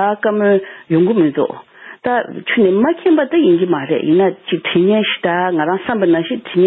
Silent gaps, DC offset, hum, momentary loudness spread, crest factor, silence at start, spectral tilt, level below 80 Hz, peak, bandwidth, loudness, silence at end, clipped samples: none; under 0.1%; none; 6 LU; 12 dB; 0 s; -11 dB/octave; -58 dBFS; -4 dBFS; 4 kHz; -15 LUFS; 0 s; under 0.1%